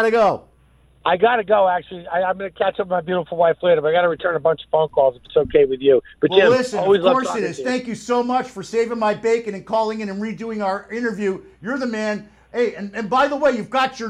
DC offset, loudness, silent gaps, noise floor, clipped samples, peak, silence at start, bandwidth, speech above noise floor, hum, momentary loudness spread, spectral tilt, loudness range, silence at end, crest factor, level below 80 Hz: under 0.1%; -19 LUFS; none; -54 dBFS; under 0.1%; -2 dBFS; 0 s; 11 kHz; 35 dB; none; 9 LU; -5 dB/octave; 6 LU; 0 s; 18 dB; -54 dBFS